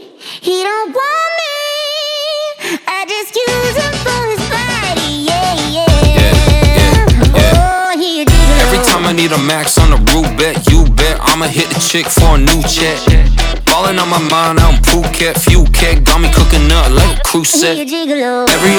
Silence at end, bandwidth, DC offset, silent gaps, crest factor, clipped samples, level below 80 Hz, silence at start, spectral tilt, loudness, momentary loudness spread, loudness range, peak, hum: 0 s; 20 kHz; under 0.1%; none; 10 dB; 0.4%; -14 dBFS; 0 s; -4 dB/octave; -11 LUFS; 7 LU; 6 LU; 0 dBFS; none